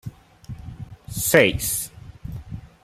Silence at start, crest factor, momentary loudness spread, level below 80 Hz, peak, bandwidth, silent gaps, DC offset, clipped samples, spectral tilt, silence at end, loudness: 0.05 s; 22 dB; 24 LU; -44 dBFS; -2 dBFS; 16 kHz; none; under 0.1%; under 0.1%; -3.5 dB/octave; 0.15 s; -19 LUFS